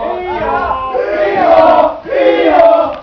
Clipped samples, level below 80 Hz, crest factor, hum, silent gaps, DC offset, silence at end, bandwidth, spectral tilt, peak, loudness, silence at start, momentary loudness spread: 0.6%; -38 dBFS; 10 dB; none; none; under 0.1%; 0 s; 5.4 kHz; -7 dB/octave; 0 dBFS; -10 LUFS; 0 s; 9 LU